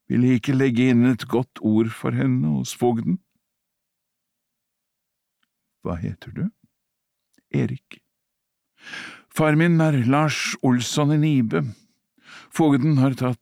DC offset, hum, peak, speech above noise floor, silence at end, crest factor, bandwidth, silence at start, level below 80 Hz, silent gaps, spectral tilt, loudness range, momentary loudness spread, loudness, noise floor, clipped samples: under 0.1%; none; -8 dBFS; 60 dB; 0.05 s; 14 dB; 15.5 kHz; 0.1 s; -58 dBFS; none; -6.5 dB/octave; 15 LU; 14 LU; -21 LUFS; -80 dBFS; under 0.1%